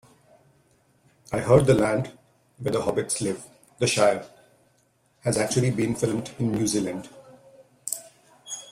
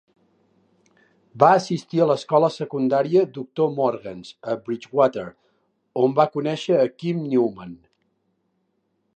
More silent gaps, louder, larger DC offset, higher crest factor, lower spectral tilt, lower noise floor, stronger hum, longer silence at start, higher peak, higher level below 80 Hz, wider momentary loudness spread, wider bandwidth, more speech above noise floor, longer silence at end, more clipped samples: neither; second, -25 LUFS vs -21 LUFS; neither; about the same, 22 dB vs 22 dB; second, -5 dB/octave vs -7 dB/octave; second, -65 dBFS vs -71 dBFS; neither; about the same, 1.3 s vs 1.35 s; about the same, -4 dBFS vs -2 dBFS; first, -54 dBFS vs -68 dBFS; about the same, 16 LU vs 15 LU; first, 16 kHz vs 9.2 kHz; second, 42 dB vs 50 dB; second, 0 s vs 1.45 s; neither